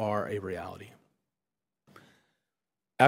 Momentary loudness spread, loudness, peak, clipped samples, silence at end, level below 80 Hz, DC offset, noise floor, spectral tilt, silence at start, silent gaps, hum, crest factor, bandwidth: 26 LU; -35 LUFS; -4 dBFS; under 0.1%; 0 s; -70 dBFS; under 0.1%; under -90 dBFS; -6 dB/octave; 0 s; none; none; 28 dB; 16 kHz